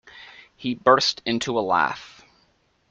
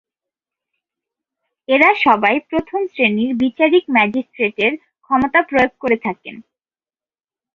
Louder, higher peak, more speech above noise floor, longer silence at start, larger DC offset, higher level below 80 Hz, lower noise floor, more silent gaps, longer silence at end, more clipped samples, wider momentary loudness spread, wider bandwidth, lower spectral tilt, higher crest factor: second, -22 LUFS vs -16 LUFS; about the same, -2 dBFS vs -2 dBFS; second, 43 dB vs over 74 dB; second, 0.15 s vs 1.7 s; neither; second, -62 dBFS vs -54 dBFS; second, -65 dBFS vs under -90 dBFS; neither; second, 0.85 s vs 1.15 s; neither; first, 20 LU vs 9 LU; first, 9 kHz vs 7 kHz; second, -3.5 dB/octave vs -6.5 dB/octave; about the same, 22 dB vs 18 dB